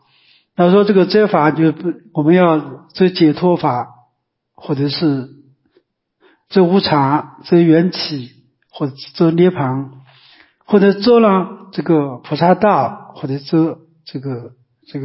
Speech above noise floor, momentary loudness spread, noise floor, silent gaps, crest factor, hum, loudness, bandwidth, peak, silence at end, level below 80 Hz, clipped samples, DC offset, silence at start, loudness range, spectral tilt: 56 dB; 17 LU; -69 dBFS; none; 14 dB; none; -15 LUFS; 5.8 kHz; 0 dBFS; 0 s; -60 dBFS; under 0.1%; under 0.1%; 0.6 s; 4 LU; -11 dB/octave